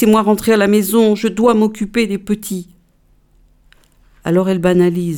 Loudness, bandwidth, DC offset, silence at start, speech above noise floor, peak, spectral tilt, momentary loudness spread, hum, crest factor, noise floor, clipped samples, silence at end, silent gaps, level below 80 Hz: -14 LUFS; 19 kHz; under 0.1%; 0 s; 40 dB; 0 dBFS; -6 dB/octave; 9 LU; none; 14 dB; -53 dBFS; under 0.1%; 0 s; none; -46 dBFS